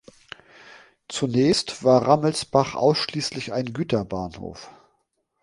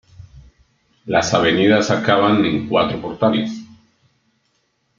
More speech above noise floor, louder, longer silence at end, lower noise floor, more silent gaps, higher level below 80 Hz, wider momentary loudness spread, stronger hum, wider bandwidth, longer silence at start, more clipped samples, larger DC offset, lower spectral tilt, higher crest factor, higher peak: about the same, 50 dB vs 50 dB; second, -22 LUFS vs -17 LUFS; second, 0.7 s vs 1.35 s; first, -72 dBFS vs -66 dBFS; neither; about the same, -54 dBFS vs -52 dBFS; first, 23 LU vs 9 LU; neither; first, 11.5 kHz vs 7.6 kHz; first, 0.65 s vs 0.2 s; neither; neither; about the same, -5 dB/octave vs -5 dB/octave; about the same, 20 dB vs 18 dB; about the same, -2 dBFS vs 0 dBFS